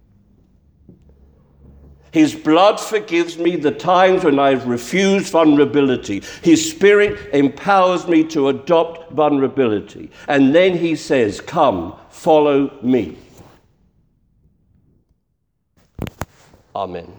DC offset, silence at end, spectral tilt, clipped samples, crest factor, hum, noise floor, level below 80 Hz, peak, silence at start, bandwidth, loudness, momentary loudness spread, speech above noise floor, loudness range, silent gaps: under 0.1%; 0.1 s; -5 dB/octave; under 0.1%; 16 dB; none; -70 dBFS; -50 dBFS; -2 dBFS; 2.15 s; over 20 kHz; -16 LUFS; 14 LU; 54 dB; 6 LU; none